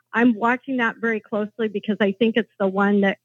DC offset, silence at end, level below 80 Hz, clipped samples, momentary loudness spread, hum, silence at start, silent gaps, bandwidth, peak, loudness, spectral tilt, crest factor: under 0.1%; 0.1 s; -88 dBFS; under 0.1%; 7 LU; none; 0.15 s; none; 7 kHz; -6 dBFS; -22 LUFS; -7.5 dB/octave; 16 dB